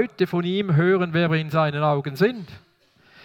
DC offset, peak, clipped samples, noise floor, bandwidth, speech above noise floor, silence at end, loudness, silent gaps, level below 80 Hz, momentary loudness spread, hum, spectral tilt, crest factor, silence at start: under 0.1%; -6 dBFS; under 0.1%; -58 dBFS; 15.5 kHz; 36 dB; 0.7 s; -21 LUFS; none; -64 dBFS; 4 LU; none; -8 dB/octave; 16 dB; 0 s